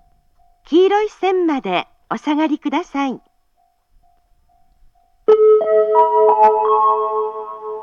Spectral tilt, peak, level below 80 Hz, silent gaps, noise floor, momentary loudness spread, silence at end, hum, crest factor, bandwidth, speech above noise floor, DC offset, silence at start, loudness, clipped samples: -5.5 dB/octave; 0 dBFS; -58 dBFS; none; -61 dBFS; 13 LU; 0 s; none; 16 dB; 7 kHz; 46 dB; under 0.1%; 0.7 s; -16 LUFS; under 0.1%